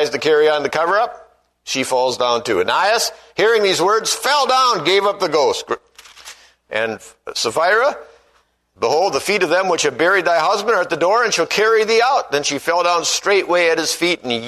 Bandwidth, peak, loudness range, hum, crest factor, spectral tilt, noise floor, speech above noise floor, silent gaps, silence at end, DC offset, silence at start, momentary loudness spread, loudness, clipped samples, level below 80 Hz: 13.5 kHz; -2 dBFS; 4 LU; none; 16 dB; -2 dB/octave; -59 dBFS; 43 dB; none; 0 s; under 0.1%; 0 s; 8 LU; -16 LUFS; under 0.1%; -60 dBFS